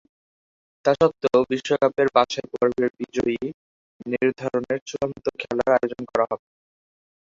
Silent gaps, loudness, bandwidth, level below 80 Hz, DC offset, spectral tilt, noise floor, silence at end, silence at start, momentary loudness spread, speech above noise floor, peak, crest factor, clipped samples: 3.54-4.00 s, 4.82-4.86 s; -23 LUFS; 7.8 kHz; -58 dBFS; under 0.1%; -5.5 dB/octave; under -90 dBFS; 0.85 s; 0.85 s; 10 LU; over 68 dB; -2 dBFS; 22 dB; under 0.1%